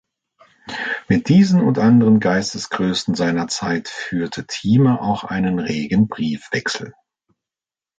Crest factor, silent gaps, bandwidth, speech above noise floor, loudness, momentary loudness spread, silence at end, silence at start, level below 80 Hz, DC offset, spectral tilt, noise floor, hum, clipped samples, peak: 16 dB; none; 9.2 kHz; over 73 dB; -18 LUFS; 11 LU; 1.1 s; 0.65 s; -50 dBFS; under 0.1%; -6 dB/octave; under -90 dBFS; none; under 0.1%; -2 dBFS